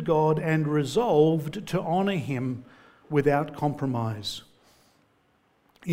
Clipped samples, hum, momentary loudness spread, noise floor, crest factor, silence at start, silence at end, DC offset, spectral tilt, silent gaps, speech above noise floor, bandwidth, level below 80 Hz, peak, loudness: under 0.1%; none; 12 LU; -66 dBFS; 18 dB; 0 s; 0 s; under 0.1%; -7 dB/octave; none; 41 dB; 16 kHz; -58 dBFS; -8 dBFS; -26 LUFS